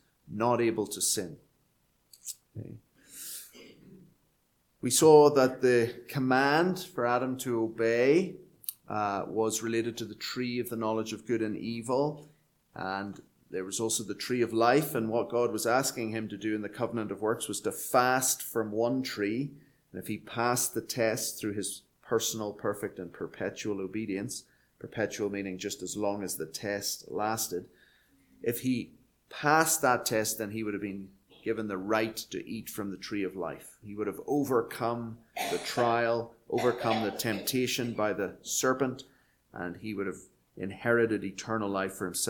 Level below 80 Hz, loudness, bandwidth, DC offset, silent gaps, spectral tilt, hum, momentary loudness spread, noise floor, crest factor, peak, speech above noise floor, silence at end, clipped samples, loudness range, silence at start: -68 dBFS; -30 LUFS; 19 kHz; under 0.1%; none; -4 dB/octave; none; 15 LU; -72 dBFS; 24 dB; -6 dBFS; 42 dB; 0 s; under 0.1%; 9 LU; 0.25 s